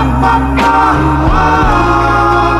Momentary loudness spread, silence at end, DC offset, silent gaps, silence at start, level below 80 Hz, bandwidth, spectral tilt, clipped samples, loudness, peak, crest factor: 2 LU; 0 s; under 0.1%; none; 0 s; -18 dBFS; 13.5 kHz; -6.5 dB/octave; under 0.1%; -10 LUFS; 0 dBFS; 10 dB